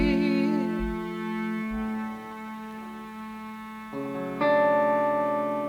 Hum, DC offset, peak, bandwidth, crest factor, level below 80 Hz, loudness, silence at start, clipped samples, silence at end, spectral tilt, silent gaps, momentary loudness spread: 60 Hz at -60 dBFS; under 0.1%; -12 dBFS; 17 kHz; 16 dB; -46 dBFS; -27 LUFS; 0 s; under 0.1%; 0 s; -7 dB/octave; none; 16 LU